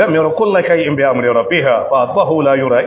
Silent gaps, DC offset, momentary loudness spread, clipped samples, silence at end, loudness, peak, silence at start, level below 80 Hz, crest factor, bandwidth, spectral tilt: none; under 0.1%; 2 LU; under 0.1%; 0 s; -13 LUFS; 0 dBFS; 0 s; -52 dBFS; 12 dB; 4 kHz; -10 dB/octave